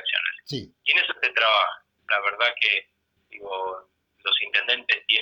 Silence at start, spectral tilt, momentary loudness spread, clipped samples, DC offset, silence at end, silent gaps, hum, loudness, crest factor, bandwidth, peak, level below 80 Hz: 0 s; -2.5 dB/octave; 14 LU; under 0.1%; under 0.1%; 0 s; none; none; -22 LUFS; 20 dB; 19.5 kHz; -6 dBFS; -70 dBFS